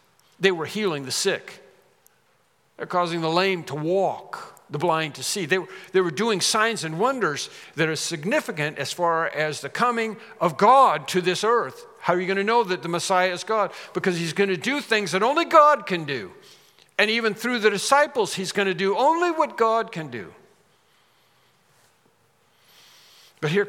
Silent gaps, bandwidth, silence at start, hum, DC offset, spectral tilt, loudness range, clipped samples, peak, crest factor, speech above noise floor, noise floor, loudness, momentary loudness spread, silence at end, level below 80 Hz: none; 17 kHz; 0.4 s; none; under 0.1%; -3.5 dB/octave; 6 LU; under 0.1%; -2 dBFS; 22 dB; 42 dB; -64 dBFS; -22 LUFS; 11 LU; 0 s; -80 dBFS